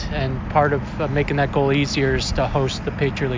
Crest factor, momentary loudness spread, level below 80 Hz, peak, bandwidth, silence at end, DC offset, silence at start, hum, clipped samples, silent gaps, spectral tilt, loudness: 18 dB; 5 LU; -32 dBFS; -2 dBFS; 7.6 kHz; 0 s; under 0.1%; 0 s; none; under 0.1%; none; -6 dB/octave; -21 LUFS